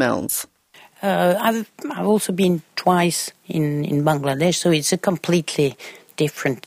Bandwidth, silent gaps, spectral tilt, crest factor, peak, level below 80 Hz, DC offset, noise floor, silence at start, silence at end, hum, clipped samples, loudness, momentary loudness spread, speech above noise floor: 16 kHz; none; -4.5 dB/octave; 18 dB; -4 dBFS; -60 dBFS; under 0.1%; -50 dBFS; 0 s; 0.05 s; none; under 0.1%; -20 LUFS; 8 LU; 30 dB